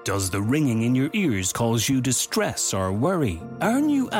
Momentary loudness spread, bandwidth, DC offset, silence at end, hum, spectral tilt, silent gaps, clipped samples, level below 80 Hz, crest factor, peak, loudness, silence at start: 3 LU; 16.5 kHz; under 0.1%; 0 s; none; -4.5 dB/octave; none; under 0.1%; -54 dBFS; 12 dB; -10 dBFS; -23 LUFS; 0 s